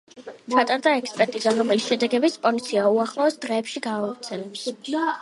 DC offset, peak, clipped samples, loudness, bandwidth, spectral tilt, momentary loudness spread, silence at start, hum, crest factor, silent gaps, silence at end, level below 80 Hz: under 0.1%; -4 dBFS; under 0.1%; -23 LUFS; 11.5 kHz; -4 dB/octave; 11 LU; 0.15 s; none; 20 dB; none; 0 s; -76 dBFS